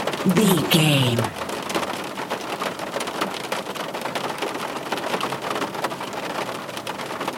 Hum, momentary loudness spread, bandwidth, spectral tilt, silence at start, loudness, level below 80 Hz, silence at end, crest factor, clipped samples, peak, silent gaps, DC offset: none; 11 LU; 17 kHz; -4.5 dB/octave; 0 s; -24 LUFS; -62 dBFS; 0 s; 20 dB; under 0.1%; -4 dBFS; none; under 0.1%